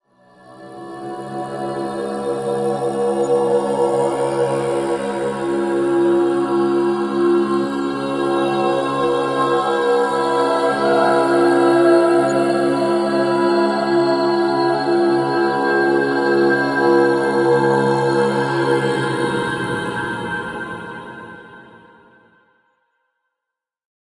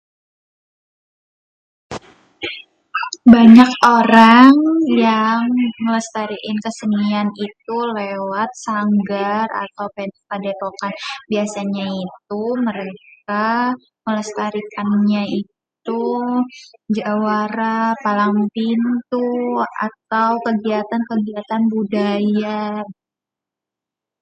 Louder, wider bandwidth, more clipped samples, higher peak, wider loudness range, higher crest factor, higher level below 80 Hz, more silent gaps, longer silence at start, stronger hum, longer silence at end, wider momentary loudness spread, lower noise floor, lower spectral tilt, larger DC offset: about the same, -17 LUFS vs -16 LUFS; first, 11.5 kHz vs 8.8 kHz; second, under 0.1% vs 0.3%; about the same, -2 dBFS vs 0 dBFS; second, 8 LU vs 12 LU; about the same, 16 dB vs 16 dB; about the same, -58 dBFS vs -56 dBFS; neither; second, 0.5 s vs 1.9 s; neither; first, 2.5 s vs 1.3 s; second, 10 LU vs 17 LU; about the same, -83 dBFS vs -86 dBFS; about the same, -6 dB/octave vs -6 dB/octave; neither